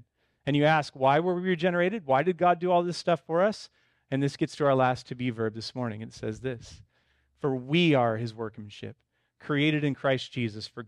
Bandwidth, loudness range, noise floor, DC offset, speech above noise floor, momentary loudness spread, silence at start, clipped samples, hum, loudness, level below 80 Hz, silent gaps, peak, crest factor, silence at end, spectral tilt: 11 kHz; 5 LU; -70 dBFS; under 0.1%; 43 dB; 14 LU; 0.45 s; under 0.1%; none; -27 LUFS; -64 dBFS; none; -10 dBFS; 18 dB; 0 s; -6.5 dB/octave